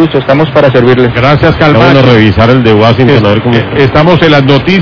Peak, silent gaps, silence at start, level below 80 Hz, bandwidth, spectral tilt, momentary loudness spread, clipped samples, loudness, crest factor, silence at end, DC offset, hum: 0 dBFS; none; 0 s; -28 dBFS; 5.4 kHz; -8 dB/octave; 4 LU; 20%; -5 LUFS; 4 dB; 0 s; under 0.1%; none